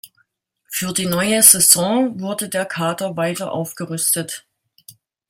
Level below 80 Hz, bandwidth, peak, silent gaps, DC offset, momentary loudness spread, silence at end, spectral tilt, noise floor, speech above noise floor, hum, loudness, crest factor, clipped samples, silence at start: -60 dBFS; 17 kHz; 0 dBFS; none; under 0.1%; 16 LU; 0.4 s; -2.5 dB/octave; -65 dBFS; 47 dB; none; -16 LUFS; 20 dB; under 0.1%; 0.05 s